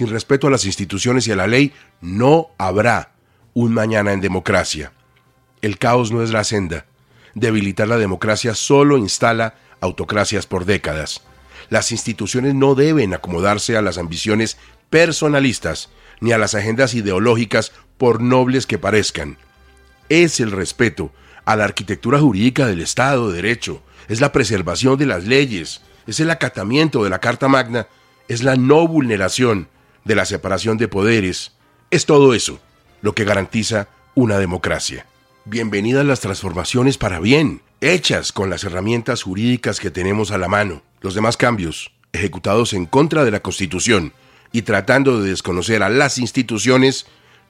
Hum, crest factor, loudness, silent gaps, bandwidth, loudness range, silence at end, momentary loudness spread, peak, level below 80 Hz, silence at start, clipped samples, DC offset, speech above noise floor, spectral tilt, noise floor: none; 16 dB; -17 LUFS; none; 15 kHz; 3 LU; 0.5 s; 11 LU; 0 dBFS; -46 dBFS; 0 s; under 0.1%; under 0.1%; 39 dB; -5 dB/octave; -56 dBFS